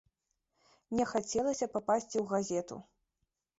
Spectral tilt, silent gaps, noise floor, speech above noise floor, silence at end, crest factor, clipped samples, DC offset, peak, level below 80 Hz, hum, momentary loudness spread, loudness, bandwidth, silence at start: -5 dB/octave; none; -84 dBFS; 51 dB; 0.75 s; 18 dB; under 0.1%; under 0.1%; -18 dBFS; -68 dBFS; none; 6 LU; -34 LUFS; 8 kHz; 0.9 s